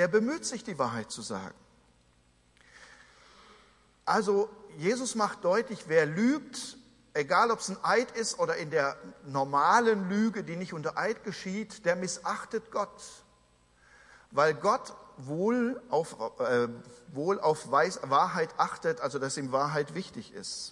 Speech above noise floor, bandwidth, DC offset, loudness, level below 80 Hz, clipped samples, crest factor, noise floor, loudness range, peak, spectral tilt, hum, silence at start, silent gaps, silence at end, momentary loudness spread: 35 dB; 11.5 kHz; under 0.1%; -30 LUFS; -70 dBFS; under 0.1%; 20 dB; -65 dBFS; 7 LU; -10 dBFS; -4.5 dB/octave; none; 0 s; none; 0 s; 13 LU